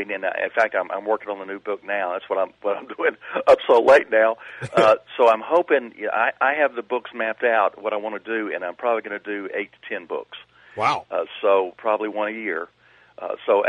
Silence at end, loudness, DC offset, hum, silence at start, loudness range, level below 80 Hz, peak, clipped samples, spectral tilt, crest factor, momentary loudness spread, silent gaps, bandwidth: 0 s; -22 LUFS; under 0.1%; none; 0 s; 7 LU; -66 dBFS; -4 dBFS; under 0.1%; -5 dB/octave; 18 dB; 13 LU; none; 10.5 kHz